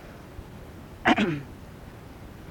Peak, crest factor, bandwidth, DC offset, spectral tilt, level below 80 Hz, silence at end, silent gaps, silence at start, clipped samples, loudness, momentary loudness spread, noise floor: -6 dBFS; 24 dB; 18 kHz; under 0.1%; -5.5 dB/octave; -50 dBFS; 0 s; none; 0 s; under 0.1%; -25 LUFS; 22 LU; -44 dBFS